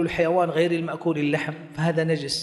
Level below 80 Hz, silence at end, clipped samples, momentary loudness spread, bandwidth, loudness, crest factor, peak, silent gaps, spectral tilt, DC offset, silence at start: -54 dBFS; 0 s; under 0.1%; 6 LU; 12 kHz; -24 LUFS; 16 dB; -8 dBFS; none; -6 dB/octave; under 0.1%; 0 s